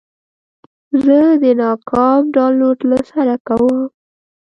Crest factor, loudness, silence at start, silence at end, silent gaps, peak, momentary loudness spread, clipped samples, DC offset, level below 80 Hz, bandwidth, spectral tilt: 14 dB; -13 LUFS; 0.95 s; 0.65 s; 3.40-3.45 s; 0 dBFS; 6 LU; under 0.1%; under 0.1%; -52 dBFS; 6 kHz; -8 dB/octave